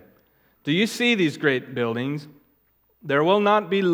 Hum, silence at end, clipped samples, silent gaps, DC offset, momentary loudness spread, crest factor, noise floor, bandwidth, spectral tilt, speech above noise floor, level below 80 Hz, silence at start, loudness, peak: none; 0 s; under 0.1%; none; under 0.1%; 12 LU; 18 dB; -65 dBFS; 16.5 kHz; -5.5 dB/octave; 43 dB; -74 dBFS; 0.65 s; -22 LUFS; -6 dBFS